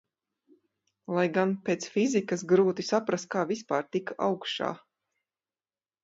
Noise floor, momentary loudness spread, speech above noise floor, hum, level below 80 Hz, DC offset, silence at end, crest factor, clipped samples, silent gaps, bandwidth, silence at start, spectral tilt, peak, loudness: under -90 dBFS; 9 LU; over 62 dB; none; -76 dBFS; under 0.1%; 1.25 s; 18 dB; under 0.1%; none; 8 kHz; 1.1 s; -5 dB/octave; -12 dBFS; -28 LUFS